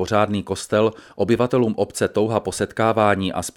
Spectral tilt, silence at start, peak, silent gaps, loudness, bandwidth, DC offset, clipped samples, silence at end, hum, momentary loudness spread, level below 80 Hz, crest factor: -5.5 dB/octave; 0 s; -2 dBFS; none; -20 LUFS; 17 kHz; under 0.1%; under 0.1%; 0.05 s; none; 5 LU; -52 dBFS; 18 dB